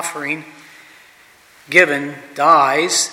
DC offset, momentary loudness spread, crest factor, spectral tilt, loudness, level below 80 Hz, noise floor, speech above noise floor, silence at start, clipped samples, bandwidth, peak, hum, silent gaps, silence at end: under 0.1%; 13 LU; 18 dB; -2 dB/octave; -15 LUFS; -66 dBFS; -48 dBFS; 32 dB; 0 s; under 0.1%; 16.5 kHz; 0 dBFS; none; none; 0 s